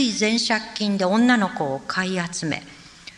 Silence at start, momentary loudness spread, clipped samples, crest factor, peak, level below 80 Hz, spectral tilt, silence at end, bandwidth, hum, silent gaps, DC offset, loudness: 0 s; 10 LU; under 0.1%; 16 dB; -6 dBFS; -60 dBFS; -4 dB/octave; 0.05 s; 11 kHz; none; none; under 0.1%; -22 LUFS